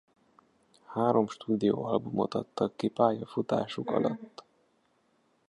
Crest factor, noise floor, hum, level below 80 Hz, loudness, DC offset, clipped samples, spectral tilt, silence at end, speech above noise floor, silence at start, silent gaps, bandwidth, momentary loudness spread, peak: 20 dB; -71 dBFS; none; -70 dBFS; -30 LUFS; under 0.1%; under 0.1%; -7.5 dB/octave; 1.2 s; 41 dB; 0.9 s; none; 11 kHz; 6 LU; -10 dBFS